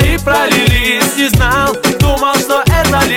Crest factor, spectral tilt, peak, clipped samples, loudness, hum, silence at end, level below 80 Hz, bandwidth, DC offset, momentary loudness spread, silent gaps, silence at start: 10 dB; -4 dB/octave; 0 dBFS; under 0.1%; -11 LUFS; none; 0 s; -20 dBFS; 18 kHz; under 0.1%; 2 LU; none; 0 s